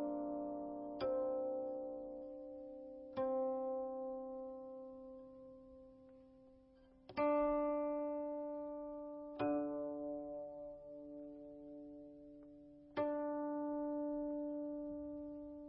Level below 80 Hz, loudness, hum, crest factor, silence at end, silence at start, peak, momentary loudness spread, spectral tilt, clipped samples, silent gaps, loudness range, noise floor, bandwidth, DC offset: -70 dBFS; -43 LUFS; none; 18 dB; 0 s; 0 s; -26 dBFS; 18 LU; -5.5 dB/octave; under 0.1%; none; 8 LU; -66 dBFS; 5.4 kHz; under 0.1%